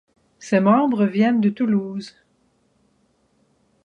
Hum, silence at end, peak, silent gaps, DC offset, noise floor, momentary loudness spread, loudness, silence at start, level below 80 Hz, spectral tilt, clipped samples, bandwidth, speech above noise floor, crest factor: none; 1.75 s; -4 dBFS; none; under 0.1%; -64 dBFS; 18 LU; -19 LUFS; 0.4 s; -68 dBFS; -7.5 dB/octave; under 0.1%; 8.4 kHz; 45 dB; 18 dB